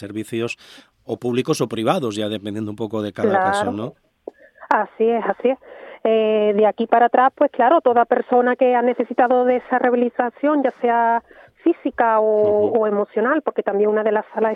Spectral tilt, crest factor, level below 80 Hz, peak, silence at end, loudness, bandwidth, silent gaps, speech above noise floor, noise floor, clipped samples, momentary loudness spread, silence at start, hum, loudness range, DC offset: -6 dB/octave; 18 dB; -66 dBFS; 0 dBFS; 0 s; -19 LUFS; 13 kHz; none; 22 dB; -40 dBFS; under 0.1%; 10 LU; 0 s; none; 6 LU; under 0.1%